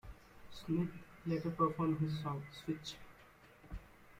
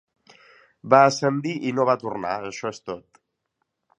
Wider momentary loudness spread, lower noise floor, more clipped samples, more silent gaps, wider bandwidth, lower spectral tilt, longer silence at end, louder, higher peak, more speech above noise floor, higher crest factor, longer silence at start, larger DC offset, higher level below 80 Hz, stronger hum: about the same, 21 LU vs 19 LU; second, -62 dBFS vs -77 dBFS; neither; neither; first, 15 kHz vs 10 kHz; first, -7.5 dB/octave vs -5.5 dB/octave; second, 0 s vs 1 s; second, -39 LUFS vs -22 LUFS; second, -20 dBFS vs 0 dBFS; second, 24 dB vs 55 dB; about the same, 20 dB vs 24 dB; second, 0.05 s vs 0.85 s; neither; first, -60 dBFS vs -68 dBFS; neither